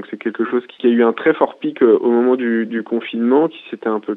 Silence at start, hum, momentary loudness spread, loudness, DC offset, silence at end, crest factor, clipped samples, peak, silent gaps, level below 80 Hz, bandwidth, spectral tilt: 0 s; none; 8 LU; -17 LUFS; under 0.1%; 0 s; 16 dB; under 0.1%; 0 dBFS; none; -70 dBFS; 4 kHz; -8.5 dB/octave